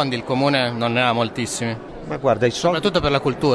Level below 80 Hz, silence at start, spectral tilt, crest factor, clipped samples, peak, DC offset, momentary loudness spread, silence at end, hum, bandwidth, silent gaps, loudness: -44 dBFS; 0 s; -5 dB/octave; 16 dB; under 0.1%; -4 dBFS; under 0.1%; 7 LU; 0 s; none; 11 kHz; none; -20 LUFS